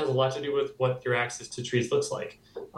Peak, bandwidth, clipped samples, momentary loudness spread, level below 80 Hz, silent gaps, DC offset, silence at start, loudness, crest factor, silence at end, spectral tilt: -12 dBFS; 12 kHz; under 0.1%; 9 LU; -68 dBFS; none; under 0.1%; 0 s; -29 LUFS; 16 dB; 0 s; -5 dB/octave